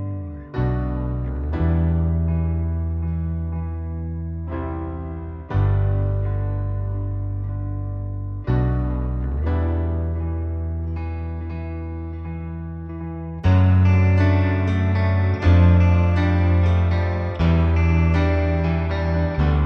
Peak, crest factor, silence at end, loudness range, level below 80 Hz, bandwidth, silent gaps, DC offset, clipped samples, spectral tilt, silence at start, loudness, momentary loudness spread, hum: -4 dBFS; 16 dB; 0 s; 8 LU; -28 dBFS; 5.6 kHz; none; under 0.1%; under 0.1%; -9.5 dB/octave; 0 s; -22 LUFS; 13 LU; none